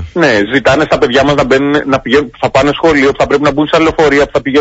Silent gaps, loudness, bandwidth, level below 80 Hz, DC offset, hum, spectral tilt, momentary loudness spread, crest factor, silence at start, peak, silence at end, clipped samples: none; -10 LUFS; 8 kHz; -34 dBFS; under 0.1%; none; -5.5 dB/octave; 2 LU; 10 dB; 0 s; 0 dBFS; 0 s; 0.1%